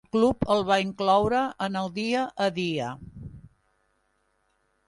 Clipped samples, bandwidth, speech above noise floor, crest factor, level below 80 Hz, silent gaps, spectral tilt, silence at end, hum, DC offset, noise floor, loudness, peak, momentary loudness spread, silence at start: under 0.1%; 11.5 kHz; 46 dB; 18 dB; -52 dBFS; none; -5.5 dB/octave; 1.5 s; none; under 0.1%; -71 dBFS; -25 LUFS; -10 dBFS; 18 LU; 0.15 s